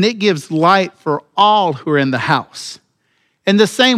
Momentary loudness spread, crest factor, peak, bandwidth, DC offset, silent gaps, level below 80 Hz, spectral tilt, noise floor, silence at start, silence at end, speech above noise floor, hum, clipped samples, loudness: 10 LU; 14 dB; 0 dBFS; 15 kHz; under 0.1%; none; -66 dBFS; -4.5 dB/octave; -63 dBFS; 0 s; 0 s; 49 dB; none; under 0.1%; -14 LUFS